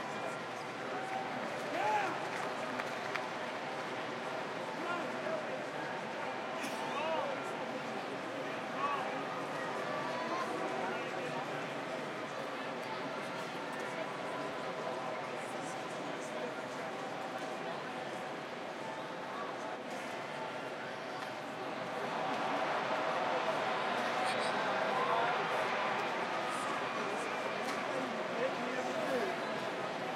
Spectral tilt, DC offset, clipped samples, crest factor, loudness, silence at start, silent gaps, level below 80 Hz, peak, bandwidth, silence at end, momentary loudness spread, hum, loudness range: -4 dB/octave; under 0.1%; under 0.1%; 18 dB; -38 LUFS; 0 s; none; -84 dBFS; -18 dBFS; 16 kHz; 0 s; 7 LU; none; 7 LU